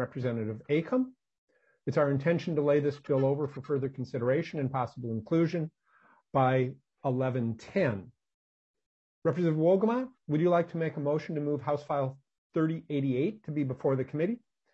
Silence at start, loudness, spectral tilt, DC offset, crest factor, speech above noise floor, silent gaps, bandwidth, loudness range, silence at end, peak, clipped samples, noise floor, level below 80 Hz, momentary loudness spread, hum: 0 s; -30 LUFS; -9 dB/octave; under 0.1%; 18 dB; 35 dB; 1.38-1.48 s, 8.34-8.74 s, 8.86-9.22 s, 12.38-12.50 s; 7.6 kHz; 3 LU; 0.35 s; -14 dBFS; under 0.1%; -65 dBFS; -72 dBFS; 8 LU; none